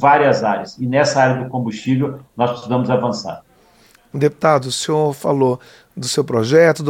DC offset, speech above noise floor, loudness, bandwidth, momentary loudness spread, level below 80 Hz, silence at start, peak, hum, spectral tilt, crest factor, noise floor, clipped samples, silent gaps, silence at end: under 0.1%; 35 dB; -17 LUFS; 16.5 kHz; 13 LU; -60 dBFS; 0 s; 0 dBFS; none; -5.5 dB/octave; 16 dB; -51 dBFS; under 0.1%; none; 0 s